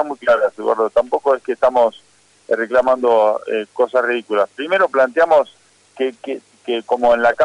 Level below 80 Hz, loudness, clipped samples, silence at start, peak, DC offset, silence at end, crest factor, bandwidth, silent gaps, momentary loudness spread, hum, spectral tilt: -56 dBFS; -17 LUFS; under 0.1%; 0 s; -4 dBFS; under 0.1%; 0 s; 12 dB; 10.5 kHz; none; 10 LU; 50 Hz at -70 dBFS; -4.5 dB/octave